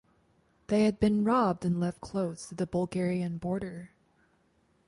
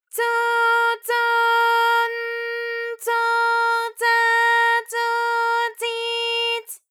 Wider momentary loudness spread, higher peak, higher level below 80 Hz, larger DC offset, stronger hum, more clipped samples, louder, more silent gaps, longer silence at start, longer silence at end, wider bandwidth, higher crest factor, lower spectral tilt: about the same, 10 LU vs 9 LU; second, -12 dBFS vs -8 dBFS; first, -56 dBFS vs under -90 dBFS; neither; neither; neither; second, -30 LUFS vs -20 LUFS; neither; first, 0.7 s vs 0.15 s; first, 1 s vs 0.15 s; second, 11.5 kHz vs 19 kHz; first, 18 dB vs 12 dB; first, -7.5 dB/octave vs 4.5 dB/octave